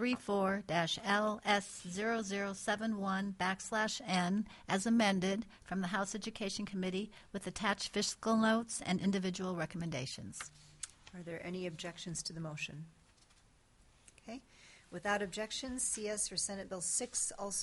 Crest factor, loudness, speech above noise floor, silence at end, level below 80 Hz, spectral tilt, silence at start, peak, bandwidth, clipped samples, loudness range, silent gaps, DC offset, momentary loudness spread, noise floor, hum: 20 dB; -37 LUFS; 30 dB; 0 s; -66 dBFS; -3.5 dB/octave; 0 s; -18 dBFS; 11.5 kHz; under 0.1%; 10 LU; none; under 0.1%; 14 LU; -67 dBFS; none